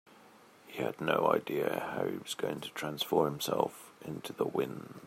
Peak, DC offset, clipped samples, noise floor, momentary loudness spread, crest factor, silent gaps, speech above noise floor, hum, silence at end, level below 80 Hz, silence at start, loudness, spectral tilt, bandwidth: -12 dBFS; under 0.1%; under 0.1%; -59 dBFS; 11 LU; 22 dB; none; 25 dB; none; 0 s; -74 dBFS; 0.25 s; -34 LUFS; -4.5 dB/octave; 16 kHz